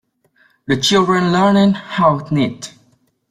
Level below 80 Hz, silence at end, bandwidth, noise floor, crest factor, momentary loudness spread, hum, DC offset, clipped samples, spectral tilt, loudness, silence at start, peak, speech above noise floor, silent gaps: -52 dBFS; 0.6 s; 14 kHz; -58 dBFS; 14 dB; 16 LU; none; under 0.1%; under 0.1%; -5.5 dB/octave; -15 LUFS; 0.7 s; -2 dBFS; 43 dB; none